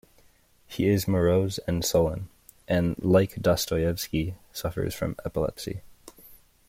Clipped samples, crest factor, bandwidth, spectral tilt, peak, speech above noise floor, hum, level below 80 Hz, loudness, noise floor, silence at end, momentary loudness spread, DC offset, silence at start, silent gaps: under 0.1%; 18 dB; 16.5 kHz; -5.5 dB/octave; -8 dBFS; 34 dB; none; -48 dBFS; -26 LUFS; -60 dBFS; 0.35 s; 14 LU; under 0.1%; 0.7 s; none